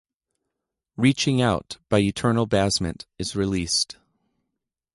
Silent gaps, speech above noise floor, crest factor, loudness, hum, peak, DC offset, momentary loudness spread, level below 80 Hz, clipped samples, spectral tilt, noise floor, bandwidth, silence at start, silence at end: none; 60 dB; 18 dB; -23 LUFS; none; -6 dBFS; under 0.1%; 9 LU; -46 dBFS; under 0.1%; -4.5 dB/octave; -83 dBFS; 11.5 kHz; 1 s; 1.05 s